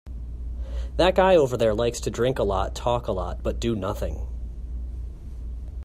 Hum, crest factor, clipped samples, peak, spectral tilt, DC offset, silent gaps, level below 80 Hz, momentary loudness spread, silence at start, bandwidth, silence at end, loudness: none; 18 dB; under 0.1%; -6 dBFS; -5.5 dB/octave; under 0.1%; none; -32 dBFS; 18 LU; 0.05 s; 15 kHz; 0 s; -24 LUFS